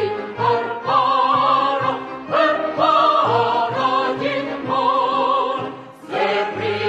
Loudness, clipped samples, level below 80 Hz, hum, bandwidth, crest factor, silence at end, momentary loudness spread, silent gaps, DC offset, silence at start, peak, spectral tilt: -18 LUFS; under 0.1%; -62 dBFS; none; 8.6 kHz; 14 dB; 0 s; 8 LU; none; under 0.1%; 0 s; -4 dBFS; -5.5 dB/octave